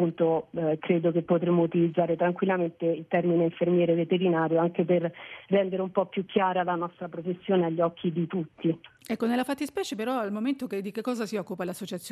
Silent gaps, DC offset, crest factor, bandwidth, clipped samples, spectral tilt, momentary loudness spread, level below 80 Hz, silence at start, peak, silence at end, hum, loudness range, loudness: none; under 0.1%; 16 dB; 13.5 kHz; under 0.1%; -7 dB/octave; 9 LU; -72 dBFS; 0 s; -10 dBFS; 0 s; none; 5 LU; -27 LUFS